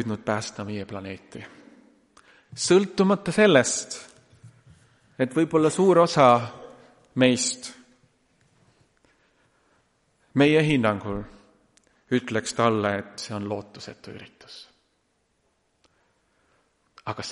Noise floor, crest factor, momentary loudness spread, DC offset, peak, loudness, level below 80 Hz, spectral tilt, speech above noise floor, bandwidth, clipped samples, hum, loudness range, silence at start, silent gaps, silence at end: -71 dBFS; 22 dB; 25 LU; under 0.1%; -4 dBFS; -23 LUFS; -60 dBFS; -4.5 dB/octave; 48 dB; 11.5 kHz; under 0.1%; none; 8 LU; 0 s; none; 0 s